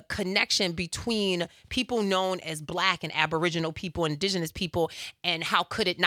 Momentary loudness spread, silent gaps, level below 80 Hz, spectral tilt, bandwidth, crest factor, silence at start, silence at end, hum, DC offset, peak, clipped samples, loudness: 6 LU; none; -56 dBFS; -3.5 dB/octave; 17 kHz; 24 dB; 0.1 s; 0 s; none; under 0.1%; -4 dBFS; under 0.1%; -28 LUFS